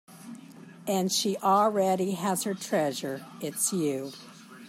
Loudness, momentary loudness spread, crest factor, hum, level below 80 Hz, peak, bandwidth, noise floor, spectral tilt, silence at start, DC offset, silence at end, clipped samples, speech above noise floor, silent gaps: -28 LUFS; 22 LU; 18 dB; none; -78 dBFS; -12 dBFS; 16 kHz; -48 dBFS; -4 dB/octave; 0.1 s; under 0.1%; 0 s; under 0.1%; 20 dB; none